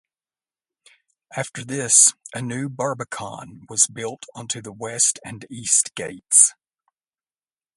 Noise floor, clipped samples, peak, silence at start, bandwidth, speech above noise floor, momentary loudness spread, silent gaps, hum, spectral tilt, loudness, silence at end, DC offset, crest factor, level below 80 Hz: under -90 dBFS; under 0.1%; 0 dBFS; 1.3 s; 16 kHz; over 68 dB; 19 LU; none; none; -1.5 dB/octave; -18 LUFS; 1.25 s; under 0.1%; 24 dB; -66 dBFS